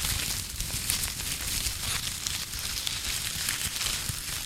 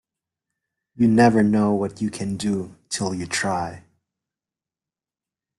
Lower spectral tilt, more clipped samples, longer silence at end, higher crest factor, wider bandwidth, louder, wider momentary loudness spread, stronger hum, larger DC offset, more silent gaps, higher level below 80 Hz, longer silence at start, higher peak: second, -0.5 dB/octave vs -5.5 dB/octave; neither; second, 0 s vs 1.8 s; first, 28 dB vs 20 dB; first, 17 kHz vs 12 kHz; second, -29 LUFS vs -21 LUFS; second, 3 LU vs 12 LU; neither; neither; neither; first, -42 dBFS vs -56 dBFS; second, 0 s vs 0.95 s; about the same, -4 dBFS vs -4 dBFS